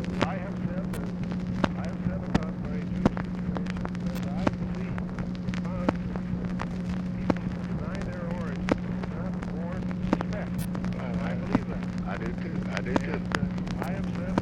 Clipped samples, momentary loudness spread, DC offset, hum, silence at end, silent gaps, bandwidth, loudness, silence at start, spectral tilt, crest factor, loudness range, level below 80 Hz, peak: under 0.1%; 4 LU; under 0.1%; none; 0 s; none; 15.5 kHz; -31 LUFS; 0 s; -7.5 dB/octave; 22 dB; 1 LU; -42 dBFS; -8 dBFS